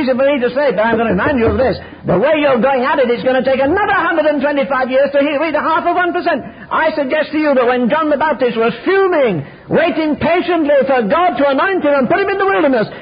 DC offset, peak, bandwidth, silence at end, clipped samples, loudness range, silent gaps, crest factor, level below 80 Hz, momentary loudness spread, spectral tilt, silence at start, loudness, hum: under 0.1%; -2 dBFS; 5.2 kHz; 0 s; under 0.1%; 1 LU; none; 10 dB; -40 dBFS; 4 LU; -11.5 dB/octave; 0 s; -14 LUFS; none